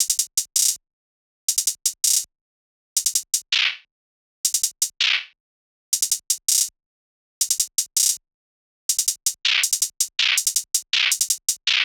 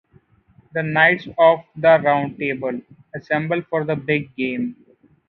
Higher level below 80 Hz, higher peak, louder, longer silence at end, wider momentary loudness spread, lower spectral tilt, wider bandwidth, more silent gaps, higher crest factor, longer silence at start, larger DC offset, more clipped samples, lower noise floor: second, -78 dBFS vs -60 dBFS; about the same, -2 dBFS vs 0 dBFS; about the same, -20 LUFS vs -19 LUFS; second, 0 s vs 0.55 s; second, 7 LU vs 13 LU; second, 7 dB/octave vs -9 dB/octave; first, over 20 kHz vs 5.8 kHz; first, 0.93-1.48 s, 2.41-2.96 s, 3.91-4.44 s, 5.40-5.92 s, 6.86-7.41 s, 8.34-8.89 s vs none; about the same, 22 dB vs 20 dB; second, 0 s vs 0.75 s; neither; neither; first, under -90 dBFS vs -55 dBFS